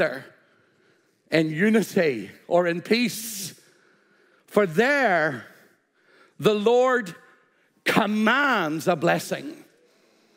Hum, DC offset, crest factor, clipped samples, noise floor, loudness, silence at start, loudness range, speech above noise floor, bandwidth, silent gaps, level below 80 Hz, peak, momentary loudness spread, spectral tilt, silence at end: none; under 0.1%; 22 dB; under 0.1%; -63 dBFS; -23 LUFS; 0 s; 2 LU; 41 dB; 16 kHz; none; -74 dBFS; -4 dBFS; 13 LU; -5 dB/octave; 0.8 s